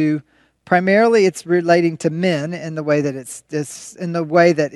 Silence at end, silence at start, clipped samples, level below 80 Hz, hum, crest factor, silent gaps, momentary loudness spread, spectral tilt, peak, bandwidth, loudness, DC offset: 0 s; 0 s; under 0.1%; -66 dBFS; none; 18 dB; none; 12 LU; -6 dB/octave; 0 dBFS; 12.5 kHz; -17 LUFS; under 0.1%